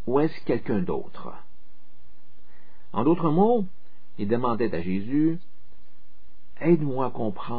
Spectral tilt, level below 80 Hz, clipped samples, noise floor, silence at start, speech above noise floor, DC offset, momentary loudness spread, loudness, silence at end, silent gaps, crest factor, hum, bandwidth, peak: -11 dB/octave; -58 dBFS; under 0.1%; -61 dBFS; 0.05 s; 36 dB; 5%; 13 LU; -25 LUFS; 0 s; none; 18 dB; none; 5 kHz; -8 dBFS